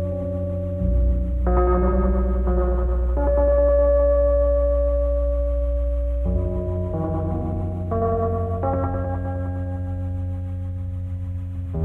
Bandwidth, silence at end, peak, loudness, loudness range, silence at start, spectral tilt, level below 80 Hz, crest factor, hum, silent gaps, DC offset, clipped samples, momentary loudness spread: 2.5 kHz; 0 s; -8 dBFS; -23 LUFS; 6 LU; 0 s; -11.5 dB/octave; -24 dBFS; 12 dB; none; none; under 0.1%; under 0.1%; 11 LU